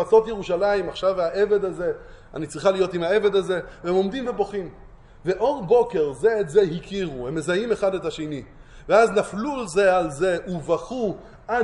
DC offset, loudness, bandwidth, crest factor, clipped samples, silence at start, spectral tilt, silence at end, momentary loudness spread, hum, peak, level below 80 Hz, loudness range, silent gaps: under 0.1%; -23 LUFS; 11.5 kHz; 18 dB; under 0.1%; 0 s; -5.5 dB/octave; 0 s; 12 LU; none; -6 dBFS; -50 dBFS; 2 LU; none